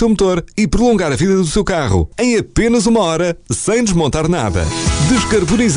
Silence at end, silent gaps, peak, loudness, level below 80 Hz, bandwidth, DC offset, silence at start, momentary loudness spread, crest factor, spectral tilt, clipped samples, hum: 0 s; none; -4 dBFS; -14 LUFS; -28 dBFS; 10.5 kHz; under 0.1%; 0 s; 4 LU; 10 dB; -5 dB/octave; under 0.1%; none